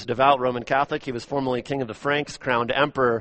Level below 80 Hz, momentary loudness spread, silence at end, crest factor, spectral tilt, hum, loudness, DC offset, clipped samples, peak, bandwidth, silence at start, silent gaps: -54 dBFS; 8 LU; 0 s; 20 dB; -5.5 dB/octave; none; -23 LUFS; under 0.1%; under 0.1%; -4 dBFS; 8.4 kHz; 0 s; none